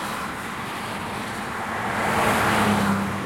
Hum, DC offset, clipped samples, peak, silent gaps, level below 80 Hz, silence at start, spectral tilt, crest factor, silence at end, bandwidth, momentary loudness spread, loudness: none; under 0.1%; under 0.1%; -8 dBFS; none; -48 dBFS; 0 s; -4.5 dB/octave; 18 dB; 0 s; 16.5 kHz; 10 LU; -24 LUFS